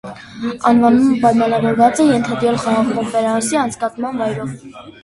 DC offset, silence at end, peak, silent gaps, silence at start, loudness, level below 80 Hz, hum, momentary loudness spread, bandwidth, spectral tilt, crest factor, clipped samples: under 0.1%; 0.15 s; 0 dBFS; none; 0.05 s; -15 LUFS; -50 dBFS; none; 13 LU; 11.5 kHz; -5.5 dB/octave; 16 dB; under 0.1%